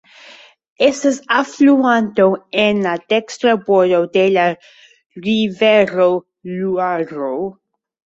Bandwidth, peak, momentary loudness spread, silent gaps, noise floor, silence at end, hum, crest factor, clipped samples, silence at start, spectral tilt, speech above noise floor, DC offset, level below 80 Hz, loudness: 8 kHz; -2 dBFS; 10 LU; 5.06-5.10 s; -43 dBFS; 0.6 s; none; 14 dB; under 0.1%; 0.8 s; -5 dB/octave; 28 dB; under 0.1%; -60 dBFS; -15 LUFS